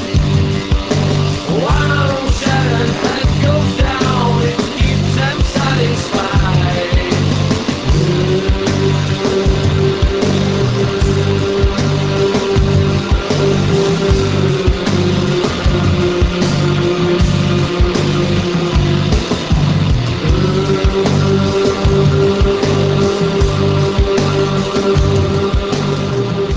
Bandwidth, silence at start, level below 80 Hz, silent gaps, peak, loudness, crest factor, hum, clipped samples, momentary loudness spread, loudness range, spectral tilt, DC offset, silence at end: 8 kHz; 0 s; -22 dBFS; none; 0 dBFS; -14 LUFS; 12 dB; none; under 0.1%; 2 LU; 1 LU; -6 dB/octave; under 0.1%; 0 s